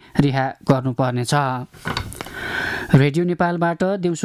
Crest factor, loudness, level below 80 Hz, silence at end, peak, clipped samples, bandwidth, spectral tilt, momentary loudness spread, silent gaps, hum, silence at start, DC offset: 14 dB; -20 LUFS; -44 dBFS; 0 s; -4 dBFS; under 0.1%; 15 kHz; -6.5 dB/octave; 11 LU; none; none; 0.15 s; under 0.1%